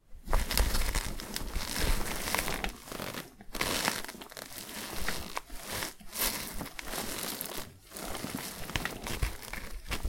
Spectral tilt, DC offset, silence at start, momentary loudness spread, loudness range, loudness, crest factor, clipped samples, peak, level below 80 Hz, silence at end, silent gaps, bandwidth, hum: -2.5 dB/octave; under 0.1%; 0.1 s; 11 LU; 3 LU; -35 LUFS; 28 dB; under 0.1%; -6 dBFS; -38 dBFS; 0 s; none; 17 kHz; none